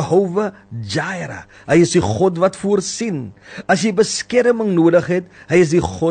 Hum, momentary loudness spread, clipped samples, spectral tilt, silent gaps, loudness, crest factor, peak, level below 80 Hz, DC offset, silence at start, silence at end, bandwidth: none; 13 LU; under 0.1%; -5.5 dB/octave; none; -17 LUFS; 14 dB; -2 dBFS; -48 dBFS; under 0.1%; 0 s; 0 s; 9.4 kHz